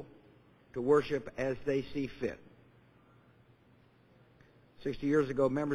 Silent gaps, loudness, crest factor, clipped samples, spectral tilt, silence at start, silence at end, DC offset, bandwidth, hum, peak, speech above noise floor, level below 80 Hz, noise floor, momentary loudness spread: none; -33 LUFS; 20 dB; under 0.1%; -7.5 dB/octave; 0 s; 0 s; under 0.1%; 10 kHz; none; -14 dBFS; 32 dB; -60 dBFS; -64 dBFS; 13 LU